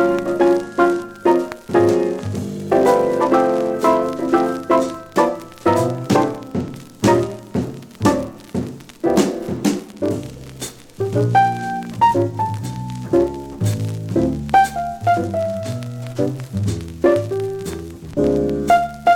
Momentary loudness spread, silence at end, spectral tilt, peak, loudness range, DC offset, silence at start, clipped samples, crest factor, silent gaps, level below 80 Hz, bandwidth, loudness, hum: 11 LU; 0 s; -6.5 dB/octave; -2 dBFS; 4 LU; under 0.1%; 0 s; under 0.1%; 16 dB; none; -46 dBFS; 17 kHz; -19 LUFS; none